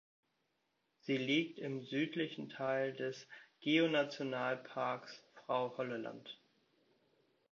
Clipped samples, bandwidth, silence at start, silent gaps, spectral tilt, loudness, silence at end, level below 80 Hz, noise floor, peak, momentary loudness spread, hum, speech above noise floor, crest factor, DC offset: under 0.1%; 7.2 kHz; 1.05 s; none; -3.5 dB/octave; -38 LUFS; 1.15 s; -88 dBFS; -83 dBFS; -20 dBFS; 18 LU; none; 44 dB; 20 dB; under 0.1%